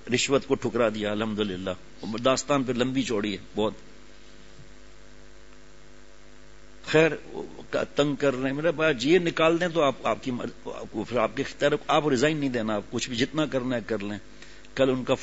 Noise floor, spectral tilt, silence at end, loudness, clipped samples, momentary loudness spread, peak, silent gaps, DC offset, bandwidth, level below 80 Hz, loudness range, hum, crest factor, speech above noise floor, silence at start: -52 dBFS; -5 dB/octave; 0 s; -26 LUFS; under 0.1%; 13 LU; -6 dBFS; none; 0.6%; 8 kHz; -54 dBFS; 6 LU; none; 20 dB; 26 dB; 0.05 s